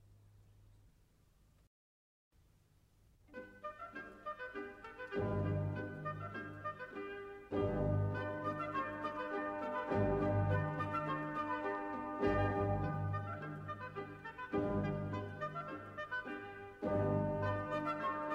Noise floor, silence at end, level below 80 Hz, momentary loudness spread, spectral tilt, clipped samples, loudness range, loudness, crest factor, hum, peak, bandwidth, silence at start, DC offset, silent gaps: -70 dBFS; 0 s; -58 dBFS; 13 LU; -8.5 dB/octave; under 0.1%; 12 LU; -40 LUFS; 18 dB; none; -22 dBFS; 7 kHz; 0.05 s; under 0.1%; 1.67-2.31 s